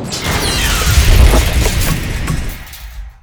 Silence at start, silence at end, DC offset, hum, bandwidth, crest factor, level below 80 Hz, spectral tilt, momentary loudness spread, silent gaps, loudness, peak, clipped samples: 0 s; 0.1 s; under 0.1%; none; over 20 kHz; 12 dB; -14 dBFS; -4 dB/octave; 19 LU; none; -13 LUFS; 0 dBFS; 0.4%